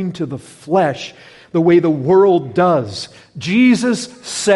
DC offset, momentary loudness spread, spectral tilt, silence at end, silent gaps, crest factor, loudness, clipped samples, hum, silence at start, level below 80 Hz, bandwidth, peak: under 0.1%; 16 LU; -5.5 dB/octave; 0 s; none; 12 dB; -15 LUFS; under 0.1%; none; 0 s; -58 dBFS; 11.5 kHz; -2 dBFS